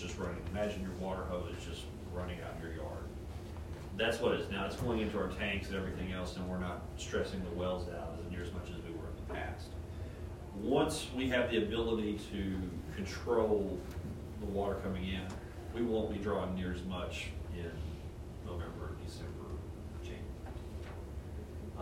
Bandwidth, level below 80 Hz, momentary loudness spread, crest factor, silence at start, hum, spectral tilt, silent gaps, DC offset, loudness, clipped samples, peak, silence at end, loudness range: 16 kHz; -48 dBFS; 12 LU; 20 dB; 0 s; none; -6 dB/octave; none; under 0.1%; -39 LUFS; under 0.1%; -18 dBFS; 0 s; 8 LU